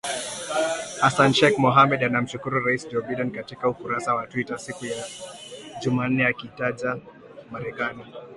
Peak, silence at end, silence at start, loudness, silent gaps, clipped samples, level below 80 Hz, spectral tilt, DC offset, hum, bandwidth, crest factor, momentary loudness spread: -4 dBFS; 0 s; 0.05 s; -23 LUFS; none; under 0.1%; -60 dBFS; -4.5 dB/octave; under 0.1%; none; 11.5 kHz; 22 dB; 17 LU